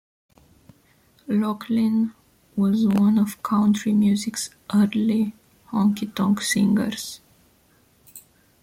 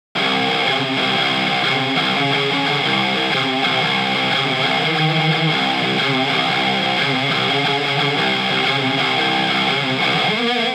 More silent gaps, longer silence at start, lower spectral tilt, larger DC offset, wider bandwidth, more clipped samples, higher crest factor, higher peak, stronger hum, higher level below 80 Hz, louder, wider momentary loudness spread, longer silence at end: neither; first, 1.3 s vs 0.15 s; about the same, -5.5 dB/octave vs -4.5 dB/octave; neither; second, 15.5 kHz vs 18 kHz; neither; about the same, 14 dB vs 14 dB; second, -10 dBFS vs -4 dBFS; neither; first, -62 dBFS vs -72 dBFS; second, -22 LUFS vs -16 LUFS; first, 9 LU vs 1 LU; first, 0.45 s vs 0 s